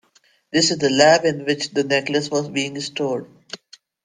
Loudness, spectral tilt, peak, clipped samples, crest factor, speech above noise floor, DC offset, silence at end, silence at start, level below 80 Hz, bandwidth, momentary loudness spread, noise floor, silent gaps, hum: -19 LUFS; -3.5 dB/octave; -2 dBFS; under 0.1%; 18 dB; 27 dB; under 0.1%; 0.5 s; 0.55 s; -62 dBFS; 10 kHz; 20 LU; -46 dBFS; none; none